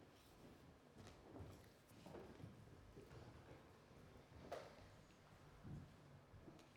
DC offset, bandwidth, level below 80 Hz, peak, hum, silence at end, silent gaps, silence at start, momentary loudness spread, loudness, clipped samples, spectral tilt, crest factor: under 0.1%; 18 kHz; -74 dBFS; -40 dBFS; none; 0 s; none; 0 s; 9 LU; -62 LUFS; under 0.1%; -6 dB/octave; 22 dB